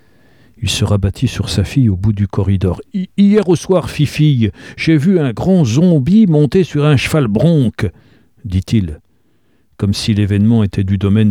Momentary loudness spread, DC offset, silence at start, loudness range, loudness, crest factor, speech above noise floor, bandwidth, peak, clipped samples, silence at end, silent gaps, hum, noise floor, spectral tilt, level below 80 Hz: 9 LU; 0.2%; 0.6 s; 5 LU; -14 LUFS; 12 dB; 46 dB; 15 kHz; 0 dBFS; under 0.1%; 0 s; none; none; -58 dBFS; -7 dB/octave; -36 dBFS